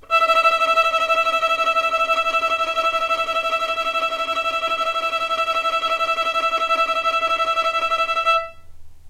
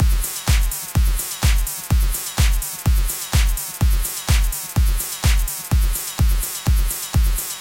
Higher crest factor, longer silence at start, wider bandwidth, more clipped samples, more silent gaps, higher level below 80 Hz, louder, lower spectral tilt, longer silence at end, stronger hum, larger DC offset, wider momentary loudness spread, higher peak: about the same, 16 dB vs 12 dB; about the same, 0.1 s vs 0 s; about the same, 16 kHz vs 17 kHz; neither; neither; second, -52 dBFS vs -20 dBFS; about the same, -19 LUFS vs -21 LUFS; second, -0.5 dB/octave vs -3.5 dB/octave; about the same, 0 s vs 0 s; neither; neither; first, 5 LU vs 2 LU; about the same, -4 dBFS vs -6 dBFS